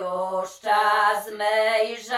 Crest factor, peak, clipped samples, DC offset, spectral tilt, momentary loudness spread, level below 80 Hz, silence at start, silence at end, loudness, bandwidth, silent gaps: 14 dB; -8 dBFS; under 0.1%; under 0.1%; -2 dB/octave; 8 LU; -74 dBFS; 0 s; 0 s; -22 LUFS; 16 kHz; none